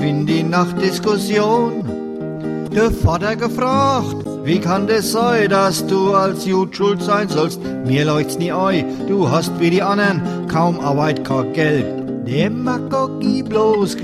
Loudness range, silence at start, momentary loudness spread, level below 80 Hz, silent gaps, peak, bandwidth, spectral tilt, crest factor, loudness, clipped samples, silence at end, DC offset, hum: 2 LU; 0 s; 6 LU; -42 dBFS; none; -2 dBFS; 15 kHz; -6 dB/octave; 14 dB; -17 LUFS; under 0.1%; 0 s; under 0.1%; none